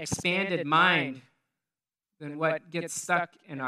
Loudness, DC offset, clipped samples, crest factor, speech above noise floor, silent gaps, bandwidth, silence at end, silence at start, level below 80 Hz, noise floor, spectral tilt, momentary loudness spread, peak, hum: -27 LUFS; under 0.1%; under 0.1%; 22 dB; over 62 dB; none; 15 kHz; 0 s; 0 s; -66 dBFS; under -90 dBFS; -3.5 dB/octave; 18 LU; -8 dBFS; none